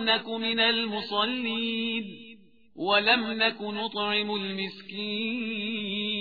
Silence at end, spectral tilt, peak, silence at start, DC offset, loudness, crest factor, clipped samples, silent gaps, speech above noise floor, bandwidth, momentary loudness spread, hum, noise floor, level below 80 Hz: 0 s; -6 dB/octave; -8 dBFS; 0 s; 0.1%; -27 LUFS; 20 dB; under 0.1%; none; 25 dB; 5 kHz; 11 LU; none; -53 dBFS; -70 dBFS